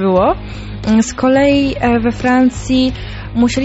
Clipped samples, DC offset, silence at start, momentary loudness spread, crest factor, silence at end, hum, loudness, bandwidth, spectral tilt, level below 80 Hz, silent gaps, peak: under 0.1%; 0.2%; 0 s; 11 LU; 12 dB; 0 s; none; -14 LUFS; 8.2 kHz; -5.5 dB/octave; -30 dBFS; none; -2 dBFS